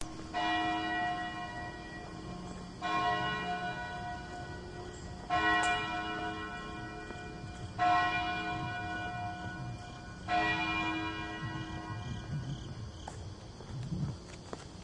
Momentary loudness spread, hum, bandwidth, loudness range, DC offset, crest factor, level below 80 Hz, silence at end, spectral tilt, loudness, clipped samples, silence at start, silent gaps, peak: 15 LU; none; 11 kHz; 5 LU; under 0.1%; 20 dB; -54 dBFS; 0 s; -4.5 dB/octave; -36 LUFS; under 0.1%; 0 s; none; -18 dBFS